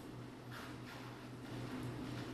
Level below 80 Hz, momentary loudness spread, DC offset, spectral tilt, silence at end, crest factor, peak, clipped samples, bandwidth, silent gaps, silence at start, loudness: -66 dBFS; 5 LU; under 0.1%; -6 dB/octave; 0 s; 14 dB; -34 dBFS; under 0.1%; 13.5 kHz; none; 0 s; -48 LUFS